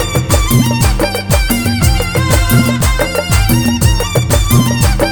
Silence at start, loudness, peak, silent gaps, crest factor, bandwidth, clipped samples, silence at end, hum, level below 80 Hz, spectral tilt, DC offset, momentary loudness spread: 0 s; -12 LUFS; 0 dBFS; none; 10 dB; 19.5 kHz; under 0.1%; 0 s; none; -16 dBFS; -5 dB/octave; under 0.1%; 3 LU